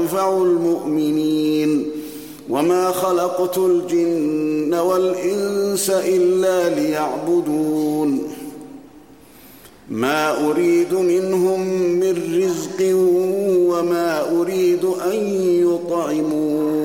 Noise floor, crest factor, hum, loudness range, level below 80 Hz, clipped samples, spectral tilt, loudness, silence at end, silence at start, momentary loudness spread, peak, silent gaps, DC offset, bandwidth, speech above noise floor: -45 dBFS; 14 dB; none; 4 LU; -62 dBFS; under 0.1%; -5.5 dB/octave; -18 LUFS; 0 s; 0 s; 5 LU; -6 dBFS; none; 0.2%; 17 kHz; 27 dB